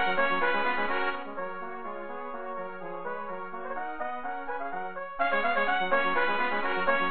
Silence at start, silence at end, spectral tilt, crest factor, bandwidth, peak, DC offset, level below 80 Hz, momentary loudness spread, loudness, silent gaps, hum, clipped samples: 0 s; 0 s; -7.5 dB/octave; 18 dB; 4.5 kHz; -12 dBFS; 1%; -60 dBFS; 12 LU; -30 LUFS; none; none; under 0.1%